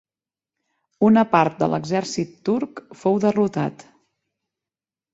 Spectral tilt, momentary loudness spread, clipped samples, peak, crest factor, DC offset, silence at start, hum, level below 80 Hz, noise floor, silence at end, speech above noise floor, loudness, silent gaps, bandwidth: -6.5 dB/octave; 11 LU; under 0.1%; -2 dBFS; 20 dB; under 0.1%; 1 s; none; -62 dBFS; under -90 dBFS; 1.4 s; over 70 dB; -21 LUFS; none; 8 kHz